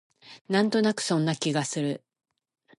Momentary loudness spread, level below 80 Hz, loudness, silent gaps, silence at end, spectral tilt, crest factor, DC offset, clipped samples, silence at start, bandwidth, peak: 7 LU; -74 dBFS; -26 LUFS; 0.41-0.45 s; 0.85 s; -5 dB/octave; 18 dB; under 0.1%; under 0.1%; 0.25 s; 11.5 kHz; -10 dBFS